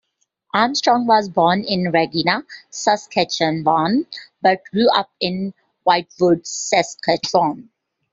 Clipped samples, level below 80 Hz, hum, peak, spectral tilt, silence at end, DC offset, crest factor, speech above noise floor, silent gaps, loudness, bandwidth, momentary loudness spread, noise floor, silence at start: under 0.1%; -60 dBFS; none; -2 dBFS; -4 dB/octave; 0.5 s; under 0.1%; 18 dB; 47 dB; none; -18 LUFS; 7.8 kHz; 7 LU; -65 dBFS; 0.55 s